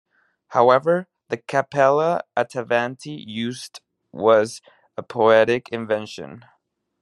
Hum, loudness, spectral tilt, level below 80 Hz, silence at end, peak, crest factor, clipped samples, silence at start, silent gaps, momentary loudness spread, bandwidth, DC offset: none; -20 LUFS; -5.5 dB/octave; -68 dBFS; 0.65 s; -2 dBFS; 20 dB; under 0.1%; 0.5 s; none; 20 LU; 12 kHz; under 0.1%